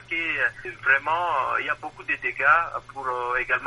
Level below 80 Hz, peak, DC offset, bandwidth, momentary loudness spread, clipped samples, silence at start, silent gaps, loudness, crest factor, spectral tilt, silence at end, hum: -54 dBFS; -6 dBFS; under 0.1%; 11.5 kHz; 11 LU; under 0.1%; 0 s; none; -24 LUFS; 18 dB; -4 dB/octave; 0 s; none